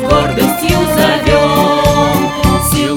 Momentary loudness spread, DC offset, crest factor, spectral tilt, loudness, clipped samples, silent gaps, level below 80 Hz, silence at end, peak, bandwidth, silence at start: 3 LU; under 0.1%; 10 dB; -5 dB/octave; -11 LUFS; under 0.1%; none; -24 dBFS; 0 s; 0 dBFS; over 20 kHz; 0 s